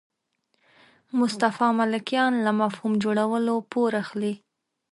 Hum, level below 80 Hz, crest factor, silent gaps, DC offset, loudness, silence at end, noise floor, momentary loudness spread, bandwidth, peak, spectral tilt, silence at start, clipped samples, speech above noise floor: none; -72 dBFS; 18 dB; none; under 0.1%; -24 LUFS; 0.55 s; -74 dBFS; 8 LU; 11.5 kHz; -8 dBFS; -5.5 dB/octave; 1.15 s; under 0.1%; 50 dB